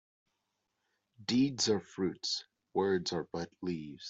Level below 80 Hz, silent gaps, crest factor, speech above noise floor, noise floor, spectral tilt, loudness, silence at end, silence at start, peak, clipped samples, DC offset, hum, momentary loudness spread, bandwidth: -72 dBFS; none; 18 dB; 50 dB; -84 dBFS; -4 dB/octave; -34 LUFS; 0 s; 1.2 s; -18 dBFS; under 0.1%; under 0.1%; none; 9 LU; 8.2 kHz